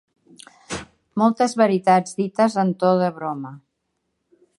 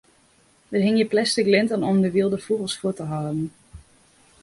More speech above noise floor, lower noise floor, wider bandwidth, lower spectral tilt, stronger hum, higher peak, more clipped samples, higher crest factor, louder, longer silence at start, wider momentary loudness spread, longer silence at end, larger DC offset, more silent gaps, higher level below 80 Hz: first, 56 dB vs 37 dB; first, -75 dBFS vs -59 dBFS; about the same, 11.5 kHz vs 11.5 kHz; about the same, -6 dB/octave vs -5.5 dB/octave; neither; about the same, -4 dBFS vs -6 dBFS; neither; about the same, 18 dB vs 18 dB; about the same, -20 LUFS vs -22 LUFS; about the same, 0.7 s vs 0.7 s; first, 15 LU vs 9 LU; first, 1.05 s vs 0.6 s; neither; neither; about the same, -60 dBFS vs -58 dBFS